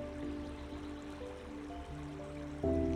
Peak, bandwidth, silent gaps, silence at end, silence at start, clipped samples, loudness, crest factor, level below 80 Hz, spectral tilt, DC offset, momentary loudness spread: -22 dBFS; 11.5 kHz; none; 0 s; 0 s; under 0.1%; -43 LUFS; 18 dB; -50 dBFS; -7.5 dB/octave; under 0.1%; 9 LU